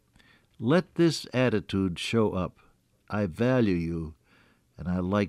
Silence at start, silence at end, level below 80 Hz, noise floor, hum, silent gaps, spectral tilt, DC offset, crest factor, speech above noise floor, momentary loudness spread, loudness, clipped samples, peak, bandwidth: 0.6 s; 0 s; -56 dBFS; -62 dBFS; none; none; -6.5 dB/octave; under 0.1%; 16 dB; 36 dB; 11 LU; -27 LUFS; under 0.1%; -12 dBFS; 13 kHz